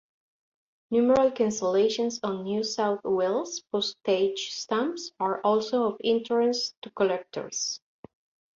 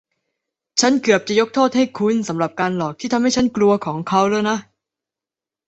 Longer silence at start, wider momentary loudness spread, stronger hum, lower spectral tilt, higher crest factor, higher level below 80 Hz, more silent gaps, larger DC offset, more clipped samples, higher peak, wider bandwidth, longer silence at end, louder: first, 0.9 s vs 0.75 s; about the same, 8 LU vs 6 LU; neither; about the same, -3.5 dB/octave vs -4.5 dB/octave; about the same, 16 dB vs 18 dB; second, -68 dBFS vs -56 dBFS; first, 6.77-6.82 s vs none; neither; neither; second, -10 dBFS vs -2 dBFS; about the same, 7.8 kHz vs 8.2 kHz; second, 0.8 s vs 1.05 s; second, -27 LUFS vs -18 LUFS